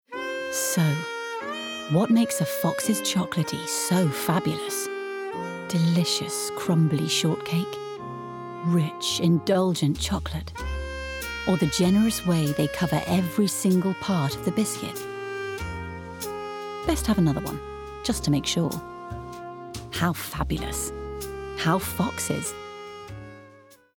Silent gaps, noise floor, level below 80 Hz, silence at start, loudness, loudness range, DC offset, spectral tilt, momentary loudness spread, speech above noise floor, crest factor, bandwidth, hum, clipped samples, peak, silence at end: none; -53 dBFS; -44 dBFS; 0.1 s; -26 LUFS; 5 LU; under 0.1%; -5 dB/octave; 13 LU; 28 dB; 16 dB; over 20 kHz; none; under 0.1%; -10 dBFS; 0.2 s